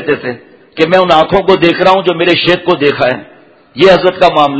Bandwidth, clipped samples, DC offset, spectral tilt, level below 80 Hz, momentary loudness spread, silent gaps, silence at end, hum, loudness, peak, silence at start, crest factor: 8 kHz; 1%; under 0.1%; -6 dB/octave; -42 dBFS; 14 LU; none; 0 s; none; -9 LUFS; 0 dBFS; 0 s; 10 dB